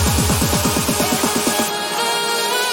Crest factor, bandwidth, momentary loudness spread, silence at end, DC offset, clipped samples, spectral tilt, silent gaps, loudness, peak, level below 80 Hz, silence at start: 14 dB; 17 kHz; 2 LU; 0 s; under 0.1%; under 0.1%; -3 dB/octave; none; -17 LUFS; -4 dBFS; -32 dBFS; 0 s